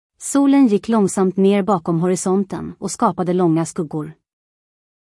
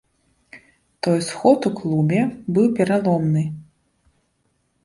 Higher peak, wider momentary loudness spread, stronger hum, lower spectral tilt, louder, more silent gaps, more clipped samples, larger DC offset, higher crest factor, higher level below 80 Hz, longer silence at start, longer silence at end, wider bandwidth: about the same, -4 dBFS vs -2 dBFS; first, 12 LU vs 7 LU; neither; about the same, -6.5 dB/octave vs -7 dB/octave; about the same, -18 LUFS vs -20 LUFS; neither; neither; neither; second, 14 dB vs 20 dB; about the same, -58 dBFS vs -58 dBFS; second, 0.2 s vs 0.55 s; second, 0.9 s vs 1.2 s; about the same, 12 kHz vs 11.5 kHz